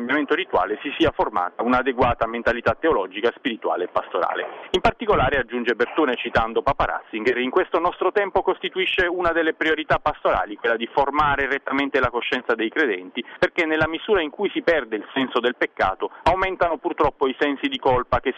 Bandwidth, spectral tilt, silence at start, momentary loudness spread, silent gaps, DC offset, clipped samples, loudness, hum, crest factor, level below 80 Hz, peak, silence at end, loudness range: 8.8 kHz; -6 dB/octave; 0 s; 4 LU; none; under 0.1%; under 0.1%; -22 LUFS; none; 14 dB; -42 dBFS; -8 dBFS; 0 s; 1 LU